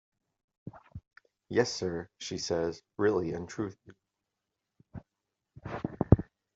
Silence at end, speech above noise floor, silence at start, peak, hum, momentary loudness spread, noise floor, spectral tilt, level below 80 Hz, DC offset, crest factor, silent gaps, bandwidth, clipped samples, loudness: 0.35 s; 54 dB; 0.65 s; -4 dBFS; none; 24 LU; -86 dBFS; -6 dB/octave; -50 dBFS; under 0.1%; 30 dB; none; 7.8 kHz; under 0.1%; -32 LUFS